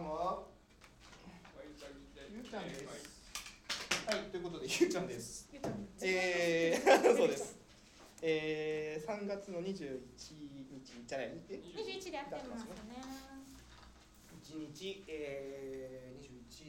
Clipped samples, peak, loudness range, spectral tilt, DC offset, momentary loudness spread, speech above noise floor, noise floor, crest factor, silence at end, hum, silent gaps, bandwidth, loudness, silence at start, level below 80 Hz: under 0.1%; -14 dBFS; 15 LU; -3.5 dB/octave; under 0.1%; 22 LU; 25 dB; -62 dBFS; 26 dB; 0 s; none; none; 16.5 kHz; -38 LUFS; 0 s; -66 dBFS